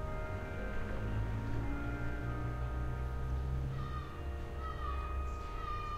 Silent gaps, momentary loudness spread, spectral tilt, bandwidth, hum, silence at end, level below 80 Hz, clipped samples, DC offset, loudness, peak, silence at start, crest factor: none; 4 LU; -7.5 dB/octave; 13 kHz; none; 0 s; -40 dBFS; under 0.1%; under 0.1%; -40 LUFS; -24 dBFS; 0 s; 12 dB